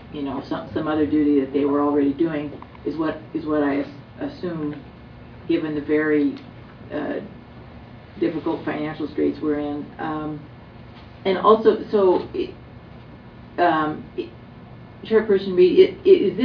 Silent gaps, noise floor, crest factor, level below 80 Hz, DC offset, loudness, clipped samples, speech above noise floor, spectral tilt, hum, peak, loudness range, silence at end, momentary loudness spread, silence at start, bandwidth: none; -42 dBFS; 20 dB; -52 dBFS; under 0.1%; -22 LUFS; under 0.1%; 21 dB; -9 dB/octave; none; -2 dBFS; 6 LU; 0 s; 25 LU; 0 s; 5.4 kHz